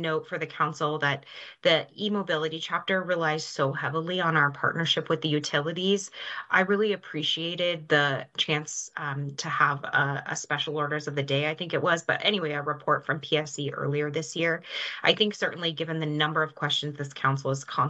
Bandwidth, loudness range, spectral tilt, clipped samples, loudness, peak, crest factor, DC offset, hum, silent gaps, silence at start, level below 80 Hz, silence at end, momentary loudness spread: 8.6 kHz; 1 LU; -4 dB/octave; under 0.1%; -27 LUFS; -6 dBFS; 22 dB; under 0.1%; none; none; 0 s; -74 dBFS; 0 s; 7 LU